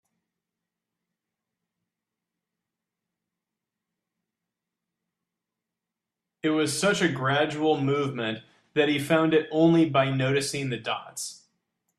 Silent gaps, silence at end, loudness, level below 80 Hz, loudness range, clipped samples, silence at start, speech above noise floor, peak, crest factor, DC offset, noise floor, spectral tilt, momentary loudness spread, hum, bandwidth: none; 0.65 s; -25 LUFS; -68 dBFS; 7 LU; under 0.1%; 6.45 s; 63 dB; -8 dBFS; 20 dB; under 0.1%; -88 dBFS; -5 dB/octave; 10 LU; none; 13.5 kHz